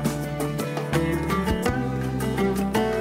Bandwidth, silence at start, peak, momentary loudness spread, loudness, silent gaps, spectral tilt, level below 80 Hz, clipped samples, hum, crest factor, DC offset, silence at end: 16 kHz; 0 s; -8 dBFS; 4 LU; -25 LUFS; none; -6 dB/octave; -38 dBFS; under 0.1%; none; 16 dB; under 0.1%; 0 s